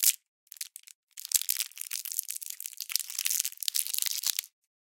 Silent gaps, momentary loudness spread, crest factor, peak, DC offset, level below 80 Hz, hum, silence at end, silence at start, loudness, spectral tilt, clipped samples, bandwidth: 0.28-0.47 s, 0.95-1.08 s; 15 LU; 32 dB; -2 dBFS; under 0.1%; under -90 dBFS; none; 0.45 s; 0 s; -30 LUFS; 9.5 dB/octave; under 0.1%; 17.5 kHz